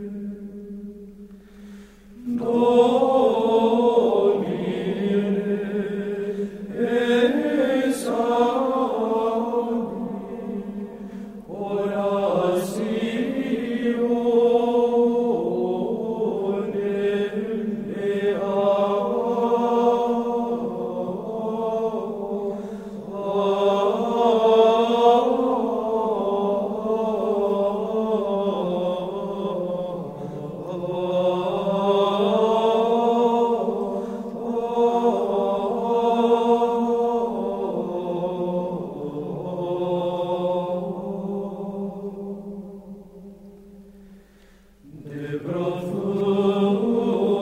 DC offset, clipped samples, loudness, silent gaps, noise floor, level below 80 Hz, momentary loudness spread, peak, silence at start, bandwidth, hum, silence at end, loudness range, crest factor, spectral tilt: under 0.1%; under 0.1%; -23 LUFS; none; -52 dBFS; -58 dBFS; 13 LU; -6 dBFS; 0 s; 14 kHz; none; 0 s; 7 LU; 18 dB; -7 dB/octave